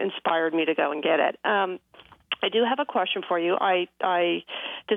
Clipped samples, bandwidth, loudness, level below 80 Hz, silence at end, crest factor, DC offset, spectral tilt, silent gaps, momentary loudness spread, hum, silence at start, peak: under 0.1%; 4 kHz; -25 LUFS; -76 dBFS; 0 s; 16 dB; under 0.1%; -6.5 dB/octave; none; 7 LU; none; 0 s; -10 dBFS